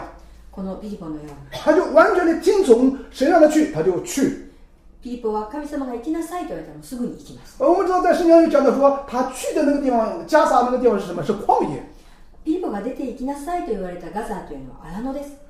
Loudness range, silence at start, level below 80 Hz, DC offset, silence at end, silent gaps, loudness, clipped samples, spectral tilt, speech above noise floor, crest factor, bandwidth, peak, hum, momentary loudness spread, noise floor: 10 LU; 0 s; -44 dBFS; under 0.1%; 0.15 s; none; -19 LUFS; under 0.1%; -5.5 dB/octave; 27 dB; 18 dB; 15.5 kHz; -2 dBFS; none; 19 LU; -47 dBFS